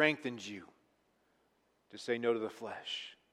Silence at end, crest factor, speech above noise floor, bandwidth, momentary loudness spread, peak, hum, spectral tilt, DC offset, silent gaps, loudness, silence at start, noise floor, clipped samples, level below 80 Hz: 0.2 s; 26 dB; 39 dB; 12.5 kHz; 14 LU; -14 dBFS; none; -4 dB/octave; under 0.1%; none; -38 LUFS; 0 s; -75 dBFS; under 0.1%; -86 dBFS